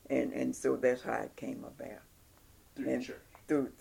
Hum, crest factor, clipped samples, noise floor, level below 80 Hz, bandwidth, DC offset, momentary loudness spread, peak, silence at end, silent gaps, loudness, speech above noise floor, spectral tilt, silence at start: none; 20 dB; under 0.1%; -61 dBFS; -66 dBFS; 17.5 kHz; under 0.1%; 17 LU; -16 dBFS; 0.05 s; none; -35 LUFS; 27 dB; -5.5 dB/octave; 0.1 s